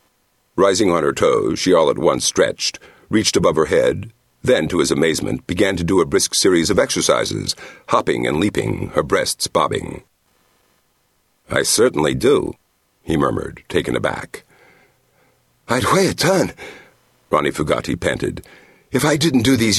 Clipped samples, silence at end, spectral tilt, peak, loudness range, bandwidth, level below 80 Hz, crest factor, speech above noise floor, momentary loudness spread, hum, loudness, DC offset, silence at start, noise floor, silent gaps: under 0.1%; 0 s; -4 dB/octave; 0 dBFS; 5 LU; 13 kHz; -44 dBFS; 18 dB; 46 dB; 10 LU; none; -18 LUFS; under 0.1%; 0.55 s; -63 dBFS; none